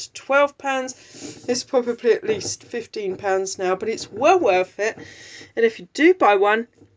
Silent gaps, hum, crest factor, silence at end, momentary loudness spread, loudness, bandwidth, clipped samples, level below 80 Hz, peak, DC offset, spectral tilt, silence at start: none; none; 18 dB; 0.3 s; 16 LU; -21 LUFS; 8 kHz; under 0.1%; -64 dBFS; -2 dBFS; under 0.1%; -3.5 dB/octave; 0 s